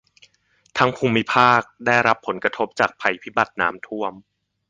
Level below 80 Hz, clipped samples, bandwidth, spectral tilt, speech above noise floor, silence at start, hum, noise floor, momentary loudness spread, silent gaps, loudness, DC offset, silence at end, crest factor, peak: -58 dBFS; under 0.1%; 9.6 kHz; -5 dB/octave; 42 dB; 0.75 s; none; -62 dBFS; 12 LU; none; -20 LUFS; under 0.1%; 0.5 s; 20 dB; 0 dBFS